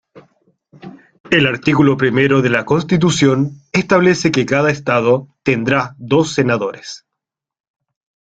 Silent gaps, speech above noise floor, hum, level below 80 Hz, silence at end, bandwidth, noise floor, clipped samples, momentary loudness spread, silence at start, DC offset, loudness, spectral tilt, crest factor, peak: 1.20-1.24 s; 67 dB; none; -50 dBFS; 1.3 s; 9.2 kHz; -81 dBFS; under 0.1%; 6 LU; 0.15 s; under 0.1%; -15 LUFS; -5.5 dB/octave; 16 dB; 0 dBFS